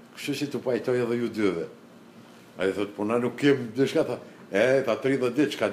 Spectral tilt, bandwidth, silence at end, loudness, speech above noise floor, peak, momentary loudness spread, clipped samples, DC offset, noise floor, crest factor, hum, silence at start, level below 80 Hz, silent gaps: -6 dB/octave; 15.5 kHz; 0 s; -26 LUFS; 24 dB; -8 dBFS; 8 LU; under 0.1%; under 0.1%; -49 dBFS; 20 dB; none; 0.05 s; -70 dBFS; none